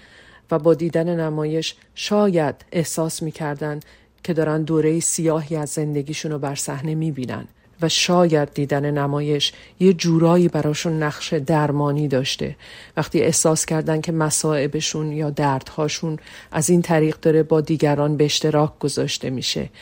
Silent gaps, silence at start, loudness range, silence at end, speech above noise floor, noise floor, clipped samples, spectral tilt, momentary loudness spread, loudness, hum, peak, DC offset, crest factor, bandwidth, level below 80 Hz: none; 0.5 s; 3 LU; 0 s; 28 dB; -48 dBFS; under 0.1%; -5 dB/octave; 9 LU; -20 LUFS; none; -4 dBFS; under 0.1%; 16 dB; 16.5 kHz; -54 dBFS